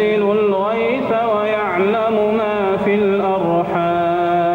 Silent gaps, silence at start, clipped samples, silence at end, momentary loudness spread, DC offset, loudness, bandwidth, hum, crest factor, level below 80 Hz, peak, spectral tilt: none; 0 s; under 0.1%; 0 s; 2 LU; under 0.1%; -17 LUFS; 6.8 kHz; 50 Hz at -45 dBFS; 10 dB; -52 dBFS; -6 dBFS; -8 dB/octave